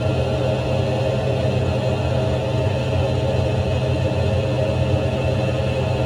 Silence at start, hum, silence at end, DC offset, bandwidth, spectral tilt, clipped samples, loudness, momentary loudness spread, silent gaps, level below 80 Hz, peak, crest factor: 0 s; none; 0 s; under 0.1%; 11 kHz; -7 dB/octave; under 0.1%; -21 LUFS; 1 LU; none; -34 dBFS; -6 dBFS; 12 dB